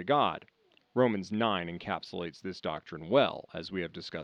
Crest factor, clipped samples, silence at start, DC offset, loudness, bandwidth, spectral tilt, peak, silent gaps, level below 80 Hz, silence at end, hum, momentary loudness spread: 22 dB; under 0.1%; 0 s; under 0.1%; -32 LUFS; 9.4 kHz; -6.5 dB/octave; -10 dBFS; none; -70 dBFS; 0 s; none; 12 LU